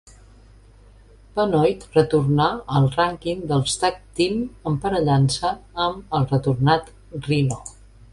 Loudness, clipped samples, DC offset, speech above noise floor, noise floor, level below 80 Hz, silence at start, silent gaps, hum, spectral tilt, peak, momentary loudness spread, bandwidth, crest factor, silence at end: -21 LUFS; under 0.1%; under 0.1%; 28 dB; -49 dBFS; -46 dBFS; 1.35 s; none; none; -6 dB/octave; -4 dBFS; 8 LU; 11.5 kHz; 18 dB; 0.4 s